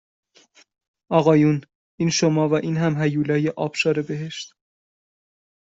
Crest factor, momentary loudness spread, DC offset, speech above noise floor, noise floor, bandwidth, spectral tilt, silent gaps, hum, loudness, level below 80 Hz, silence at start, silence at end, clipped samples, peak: 20 dB; 12 LU; under 0.1%; 36 dB; -56 dBFS; 8 kHz; -6 dB/octave; 1.75-1.98 s; none; -21 LUFS; -62 dBFS; 1.1 s; 1.25 s; under 0.1%; -4 dBFS